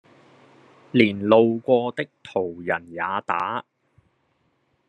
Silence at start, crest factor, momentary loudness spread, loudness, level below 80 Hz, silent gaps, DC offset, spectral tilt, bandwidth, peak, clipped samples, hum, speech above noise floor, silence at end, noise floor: 0.95 s; 22 dB; 11 LU; -22 LUFS; -70 dBFS; none; under 0.1%; -7.5 dB/octave; 9 kHz; -2 dBFS; under 0.1%; none; 46 dB; 1.25 s; -68 dBFS